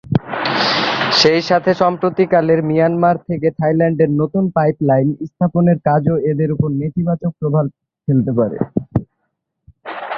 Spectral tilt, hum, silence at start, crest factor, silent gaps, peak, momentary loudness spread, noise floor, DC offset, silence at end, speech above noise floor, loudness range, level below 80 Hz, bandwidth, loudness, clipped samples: -6.5 dB/octave; none; 0.05 s; 16 dB; none; 0 dBFS; 7 LU; -72 dBFS; under 0.1%; 0 s; 57 dB; 5 LU; -48 dBFS; 7.4 kHz; -16 LUFS; under 0.1%